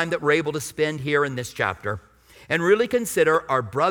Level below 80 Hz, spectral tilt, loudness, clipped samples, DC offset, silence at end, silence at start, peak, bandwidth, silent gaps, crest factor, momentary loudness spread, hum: -56 dBFS; -4.5 dB/octave; -22 LUFS; under 0.1%; under 0.1%; 0 s; 0 s; -6 dBFS; 19 kHz; none; 18 dB; 8 LU; none